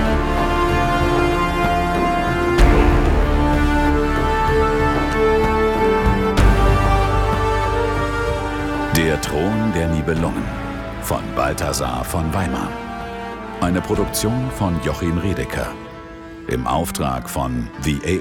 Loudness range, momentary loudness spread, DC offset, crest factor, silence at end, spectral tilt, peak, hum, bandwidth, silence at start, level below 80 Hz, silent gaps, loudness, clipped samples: 6 LU; 10 LU; under 0.1%; 18 dB; 0 s; -6 dB/octave; 0 dBFS; none; 17.5 kHz; 0 s; -24 dBFS; none; -19 LUFS; under 0.1%